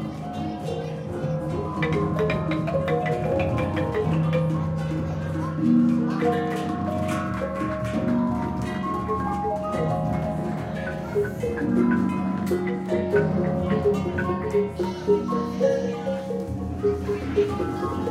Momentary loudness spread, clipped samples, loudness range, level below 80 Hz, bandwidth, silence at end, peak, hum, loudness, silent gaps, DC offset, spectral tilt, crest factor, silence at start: 6 LU; under 0.1%; 2 LU; -44 dBFS; 14 kHz; 0 s; -8 dBFS; none; -25 LUFS; none; under 0.1%; -8 dB/octave; 16 dB; 0 s